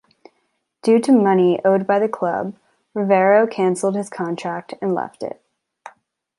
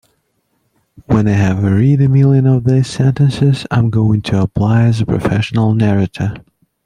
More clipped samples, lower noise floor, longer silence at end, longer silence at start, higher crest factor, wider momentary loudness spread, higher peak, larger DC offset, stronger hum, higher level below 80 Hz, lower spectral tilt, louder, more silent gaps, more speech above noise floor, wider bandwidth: neither; first, -70 dBFS vs -64 dBFS; about the same, 0.5 s vs 0.45 s; second, 0.85 s vs 1.1 s; about the same, 16 dB vs 12 dB; first, 14 LU vs 6 LU; about the same, -2 dBFS vs -2 dBFS; neither; neither; second, -70 dBFS vs -40 dBFS; second, -6.5 dB/octave vs -8 dB/octave; second, -18 LUFS vs -13 LUFS; neither; about the same, 52 dB vs 52 dB; first, 11.5 kHz vs 10 kHz